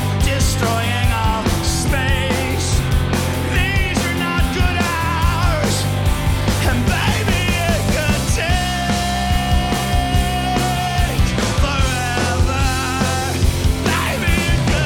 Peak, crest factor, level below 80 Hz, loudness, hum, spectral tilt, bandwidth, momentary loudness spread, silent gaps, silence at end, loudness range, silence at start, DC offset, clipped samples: -4 dBFS; 14 dB; -22 dBFS; -18 LUFS; none; -4.5 dB/octave; 18 kHz; 2 LU; none; 0 s; 1 LU; 0 s; under 0.1%; under 0.1%